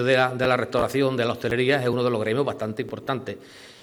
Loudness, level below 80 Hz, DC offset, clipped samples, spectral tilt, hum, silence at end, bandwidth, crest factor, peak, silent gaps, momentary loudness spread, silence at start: -24 LUFS; -56 dBFS; under 0.1%; under 0.1%; -6 dB/octave; none; 0.1 s; 18.5 kHz; 18 dB; -6 dBFS; none; 9 LU; 0 s